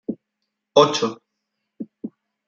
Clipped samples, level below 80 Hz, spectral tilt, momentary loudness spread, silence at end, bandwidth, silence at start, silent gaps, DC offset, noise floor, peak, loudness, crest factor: under 0.1%; -70 dBFS; -4 dB/octave; 22 LU; 0.4 s; 7.8 kHz; 0.1 s; none; under 0.1%; -79 dBFS; -2 dBFS; -19 LUFS; 22 dB